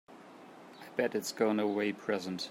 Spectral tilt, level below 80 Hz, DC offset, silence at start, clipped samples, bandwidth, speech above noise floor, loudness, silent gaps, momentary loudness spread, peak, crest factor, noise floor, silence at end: -4.5 dB/octave; -84 dBFS; under 0.1%; 0.1 s; under 0.1%; 16 kHz; 20 dB; -33 LUFS; none; 22 LU; -16 dBFS; 20 dB; -53 dBFS; 0 s